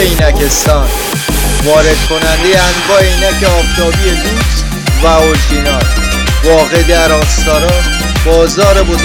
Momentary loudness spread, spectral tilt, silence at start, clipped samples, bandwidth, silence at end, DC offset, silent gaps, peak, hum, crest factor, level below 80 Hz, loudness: 4 LU; -4 dB/octave; 0 s; 0.3%; 19 kHz; 0 s; under 0.1%; none; 0 dBFS; none; 8 dB; -14 dBFS; -9 LUFS